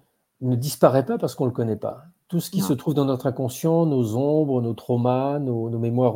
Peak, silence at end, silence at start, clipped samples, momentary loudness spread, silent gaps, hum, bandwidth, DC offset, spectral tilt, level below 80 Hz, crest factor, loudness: -2 dBFS; 0 s; 0.4 s; under 0.1%; 7 LU; none; none; 17 kHz; under 0.1%; -7.5 dB/octave; -64 dBFS; 22 dB; -23 LUFS